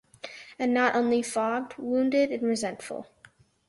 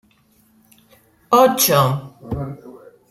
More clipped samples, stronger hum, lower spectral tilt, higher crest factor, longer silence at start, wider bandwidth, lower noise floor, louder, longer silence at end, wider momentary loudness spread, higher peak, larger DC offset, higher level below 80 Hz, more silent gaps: neither; neither; about the same, -4 dB/octave vs -4 dB/octave; about the same, 18 dB vs 18 dB; second, 0.25 s vs 1.3 s; second, 11.5 kHz vs 16 kHz; about the same, -58 dBFS vs -57 dBFS; second, -27 LUFS vs -16 LUFS; first, 0.65 s vs 0.35 s; about the same, 17 LU vs 18 LU; second, -10 dBFS vs -2 dBFS; neither; second, -70 dBFS vs -48 dBFS; neither